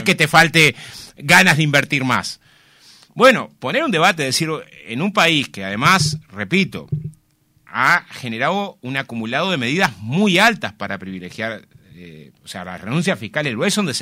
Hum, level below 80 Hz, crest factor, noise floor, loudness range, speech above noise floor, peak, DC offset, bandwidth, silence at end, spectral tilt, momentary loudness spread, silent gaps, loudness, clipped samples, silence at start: none; -54 dBFS; 18 dB; -59 dBFS; 6 LU; 41 dB; 0 dBFS; under 0.1%; 16 kHz; 0 s; -4 dB/octave; 17 LU; none; -16 LUFS; under 0.1%; 0 s